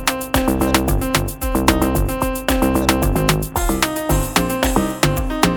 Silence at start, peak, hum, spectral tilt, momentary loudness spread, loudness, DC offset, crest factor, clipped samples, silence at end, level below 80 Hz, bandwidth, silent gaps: 0 s; 0 dBFS; none; -4.5 dB/octave; 4 LU; -18 LUFS; under 0.1%; 18 dB; under 0.1%; 0 s; -24 dBFS; 19.5 kHz; none